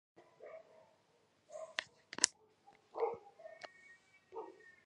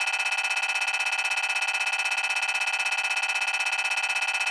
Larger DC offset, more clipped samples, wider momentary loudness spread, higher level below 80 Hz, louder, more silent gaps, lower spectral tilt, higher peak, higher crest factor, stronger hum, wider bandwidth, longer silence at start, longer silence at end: neither; neither; first, 23 LU vs 0 LU; second, -88 dBFS vs -82 dBFS; second, -40 LUFS vs -24 LUFS; neither; first, 0.5 dB/octave vs 4.5 dB/octave; first, -2 dBFS vs -14 dBFS; first, 44 dB vs 12 dB; neither; about the same, 11 kHz vs 11 kHz; first, 0.2 s vs 0 s; first, 0.15 s vs 0 s